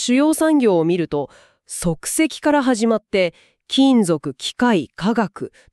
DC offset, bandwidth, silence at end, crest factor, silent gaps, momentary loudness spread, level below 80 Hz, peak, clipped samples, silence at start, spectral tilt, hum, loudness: under 0.1%; 13.5 kHz; 0.25 s; 14 dB; none; 10 LU; -50 dBFS; -4 dBFS; under 0.1%; 0 s; -4.5 dB/octave; none; -18 LUFS